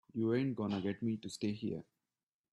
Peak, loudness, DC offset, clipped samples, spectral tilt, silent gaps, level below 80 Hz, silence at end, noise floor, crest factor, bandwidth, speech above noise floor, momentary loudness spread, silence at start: -22 dBFS; -38 LUFS; under 0.1%; under 0.1%; -7 dB/octave; none; -76 dBFS; 0.7 s; under -90 dBFS; 16 dB; 12 kHz; over 53 dB; 8 LU; 0.15 s